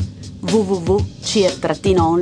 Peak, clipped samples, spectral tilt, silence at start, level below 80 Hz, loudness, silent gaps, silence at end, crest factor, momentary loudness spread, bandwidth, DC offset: -2 dBFS; under 0.1%; -5.5 dB/octave; 0 s; -36 dBFS; -18 LUFS; none; 0 s; 14 dB; 6 LU; 10.5 kHz; under 0.1%